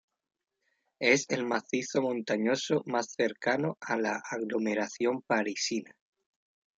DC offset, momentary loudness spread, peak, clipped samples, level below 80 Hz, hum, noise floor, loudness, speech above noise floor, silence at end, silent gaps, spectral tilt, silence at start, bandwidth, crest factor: under 0.1%; 6 LU; -10 dBFS; under 0.1%; -78 dBFS; none; -78 dBFS; -30 LUFS; 48 dB; 0.95 s; none; -4 dB/octave; 1 s; 9.2 kHz; 22 dB